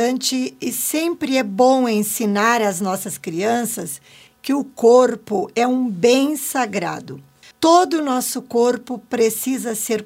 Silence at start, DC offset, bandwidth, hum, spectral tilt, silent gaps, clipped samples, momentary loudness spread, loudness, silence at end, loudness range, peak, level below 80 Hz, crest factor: 0 s; under 0.1%; 16.5 kHz; none; -3.5 dB/octave; none; under 0.1%; 12 LU; -18 LUFS; 0 s; 1 LU; 0 dBFS; -66 dBFS; 18 dB